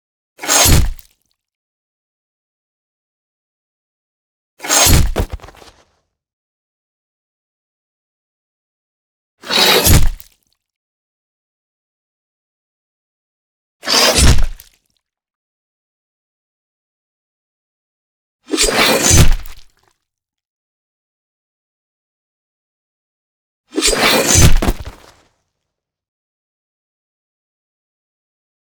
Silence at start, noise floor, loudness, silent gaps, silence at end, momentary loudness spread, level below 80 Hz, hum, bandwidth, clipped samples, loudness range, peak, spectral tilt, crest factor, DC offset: 0.4 s; -79 dBFS; -11 LUFS; 1.55-4.57 s, 6.33-9.38 s, 10.76-13.80 s, 15.35-18.39 s, 20.47-23.64 s; 3.8 s; 17 LU; -24 dBFS; none; over 20 kHz; under 0.1%; 8 LU; 0 dBFS; -3 dB/octave; 18 dB; under 0.1%